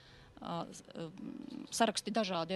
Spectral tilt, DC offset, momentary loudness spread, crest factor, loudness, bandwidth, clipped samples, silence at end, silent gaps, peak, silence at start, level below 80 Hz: -3.5 dB/octave; under 0.1%; 14 LU; 24 dB; -38 LUFS; 13.5 kHz; under 0.1%; 0 s; none; -14 dBFS; 0 s; -70 dBFS